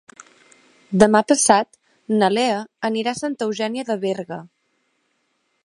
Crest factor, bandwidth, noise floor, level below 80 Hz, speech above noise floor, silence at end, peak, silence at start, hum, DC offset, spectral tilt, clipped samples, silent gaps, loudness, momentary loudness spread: 22 dB; 11.5 kHz; -69 dBFS; -58 dBFS; 50 dB; 1.2 s; 0 dBFS; 0.9 s; none; under 0.1%; -4 dB/octave; under 0.1%; none; -19 LUFS; 12 LU